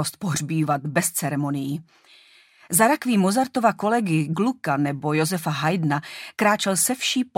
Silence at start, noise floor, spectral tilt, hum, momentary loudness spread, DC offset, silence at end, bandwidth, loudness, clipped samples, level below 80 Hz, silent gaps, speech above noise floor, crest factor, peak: 0 s; -53 dBFS; -4.5 dB/octave; none; 7 LU; under 0.1%; 0.1 s; 16.5 kHz; -22 LUFS; under 0.1%; -66 dBFS; none; 31 dB; 18 dB; -4 dBFS